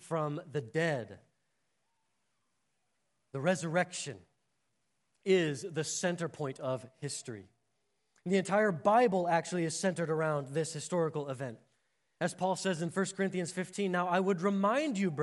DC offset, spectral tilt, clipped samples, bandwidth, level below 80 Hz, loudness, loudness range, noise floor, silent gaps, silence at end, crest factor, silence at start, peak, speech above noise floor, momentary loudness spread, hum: under 0.1%; -5 dB/octave; under 0.1%; 11.5 kHz; -82 dBFS; -33 LUFS; 7 LU; -82 dBFS; none; 0 s; 20 dB; 0 s; -14 dBFS; 49 dB; 12 LU; none